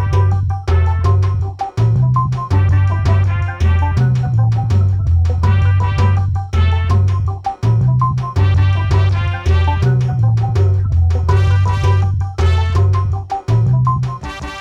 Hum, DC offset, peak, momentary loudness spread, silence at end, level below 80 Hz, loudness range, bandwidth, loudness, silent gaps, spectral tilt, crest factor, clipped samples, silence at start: none; under 0.1%; -2 dBFS; 4 LU; 0 s; -24 dBFS; 1 LU; 7.2 kHz; -15 LUFS; none; -7.5 dB/octave; 10 dB; under 0.1%; 0 s